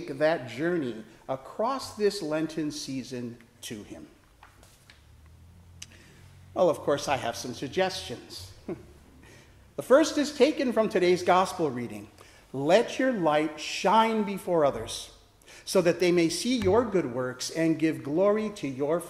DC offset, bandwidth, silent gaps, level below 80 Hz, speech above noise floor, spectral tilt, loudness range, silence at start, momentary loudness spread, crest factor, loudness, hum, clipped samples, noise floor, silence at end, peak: under 0.1%; 15 kHz; none; -60 dBFS; 28 dB; -5 dB/octave; 9 LU; 0 s; 18 LU; 20 dB; -27 LUFS; none; under 0.1%; -55 dBFS; 0 s; -8 dBFS